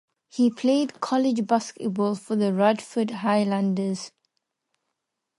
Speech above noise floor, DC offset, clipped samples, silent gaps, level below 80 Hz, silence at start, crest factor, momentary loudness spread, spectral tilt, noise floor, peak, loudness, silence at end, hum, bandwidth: 58 dB; under 0.1%; under 0.1%; none; -76 dBFS; 0.35 s; 18 dB; 8 LU; -6 dB/octave; -81 dBFS; -8 dBFS; -24 LUFS; 1.3 s; none; 11.5 kHz